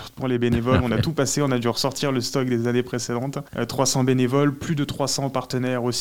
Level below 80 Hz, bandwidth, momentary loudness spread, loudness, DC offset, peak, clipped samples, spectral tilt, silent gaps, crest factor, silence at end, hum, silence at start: -48 dBFS; 17 kHz; 6 LU; -23 LUFS; 0.5%; -4 dBFS; under 0.1%; -5 dB/octave; none; 18 dB; 0 s; none; 0 s